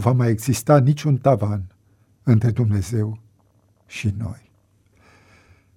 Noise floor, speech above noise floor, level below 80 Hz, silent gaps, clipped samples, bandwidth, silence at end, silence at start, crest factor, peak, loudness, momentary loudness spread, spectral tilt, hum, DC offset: -59 dBFS; 41 dB; -50 dBFS; none; under 0.1%; 15.5 kHz; 1.45 s; 0 s; 20 dB; -2 dBFS; -20 LUFS; 18 LU; -7.5 dB/octave; none; under 0.1%